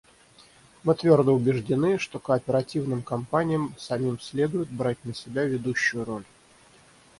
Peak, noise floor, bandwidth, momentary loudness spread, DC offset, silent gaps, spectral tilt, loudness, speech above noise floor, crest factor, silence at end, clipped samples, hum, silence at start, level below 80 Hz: -6 dBFS; -56 dBFS; 11.5 kHz; 10 LU; under 0.1%; none; -6.5 dB/octave; -26 LUFS; 31 dB; 20 dB; 0.95 s; under 0.1%; none; 0.85 s; -60 dBFS